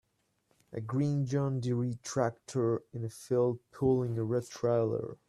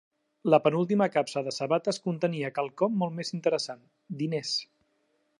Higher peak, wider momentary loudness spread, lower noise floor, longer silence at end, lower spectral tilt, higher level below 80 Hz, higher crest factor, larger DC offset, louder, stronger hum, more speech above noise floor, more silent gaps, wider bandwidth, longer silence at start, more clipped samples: second, -14 dBFS vs -8 dBFS; second, 6 LU vs 10 LU; about the same, -75 dBFS vs -73 dBFS; second, 0.15 s vs 0.75 s; first, -7.5 dB/octave vs -5.5 dB/octave; first, -66 dBFS vs -80 dBFS; about the same, 18 dB vs 20 dB; neither; second, -32 LUFS vs -28 LUFS; neither; about the same, 43 dB vs 45 dB; neither; about the same, 12.5 kHz vs 11.5 kHz; first, 0.7 s vs 0.45 s; neither